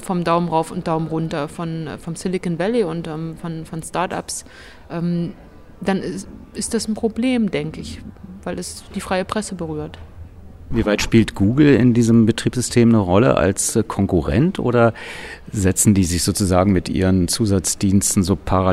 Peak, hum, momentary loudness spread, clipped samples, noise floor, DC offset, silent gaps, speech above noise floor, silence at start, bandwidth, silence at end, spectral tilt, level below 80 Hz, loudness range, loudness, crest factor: -2 dBFS; none; 15 LU; under 0.1%; -38 dBFS; under 0.1%; none; 19 dB; 0 s; 14.5 kHz; 0 s; -5.5 dB/octave; -38 dBFS; 10 LU; -19 LUFS; 18 dB